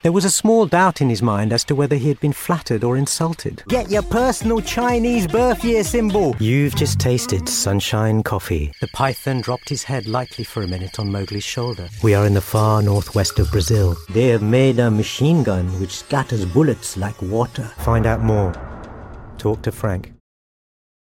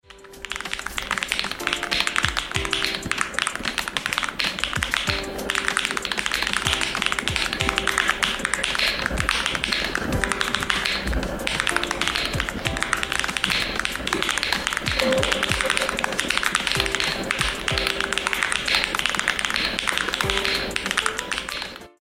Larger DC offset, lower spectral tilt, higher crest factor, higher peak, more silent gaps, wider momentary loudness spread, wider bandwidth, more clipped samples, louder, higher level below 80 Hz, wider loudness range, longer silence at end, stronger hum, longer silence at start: neither; first, -5.5 dB/octave vs -2 dB/octave; second, 16 dB vs 24 dB; about the same, -2 dBFS vs 0 dBFS; neither; first, 9 LU vs 4 LU; about the same, 17 kHz vs 17 kHz; neither; first, -19 LUFS vs -23 LUFS; about the same, -34 dBFS vs -38 dBFS; first, 5 LU vs 2 LU; first, 1.05 s vs 0.15 s; neither; about the same, 0.05 s vs 0.1 s